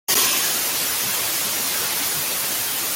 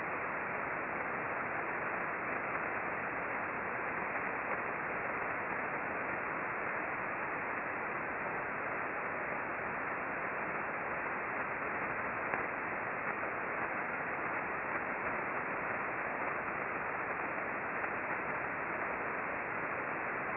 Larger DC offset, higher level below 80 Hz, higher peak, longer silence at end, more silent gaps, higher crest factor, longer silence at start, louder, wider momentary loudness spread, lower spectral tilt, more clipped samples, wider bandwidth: neither; first, -60 dBFS vs -68 dBFS; first, -6 dBFS vs -14 dBFS; about the same, 0 s vs 0 s; neither; second, 16 dB vs 22 dB; about the same, 0.1 s vs 0 s; first, -19 LUFS vs -37 LUFS; first, 4 LU vs 1 LU; second, 0.5 dB/octave vs -5 dB/octave; neither; first, 17 kHz vs 5.2 kHz